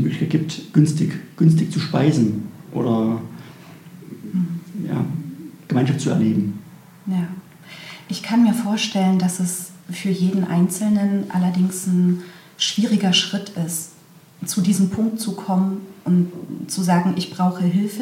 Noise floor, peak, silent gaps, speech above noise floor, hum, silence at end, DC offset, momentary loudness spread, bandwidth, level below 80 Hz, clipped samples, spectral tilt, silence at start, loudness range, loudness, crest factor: -47 dBFS; -2 dBFS; none; 28 dB; none; 0 s; under 0.1%; 15 LU; 16.5 kHz; -62 dBFS; under 0.1%; -5.5 dB/octave; 0 s; 4 LU; -20 LUFS; 18 dB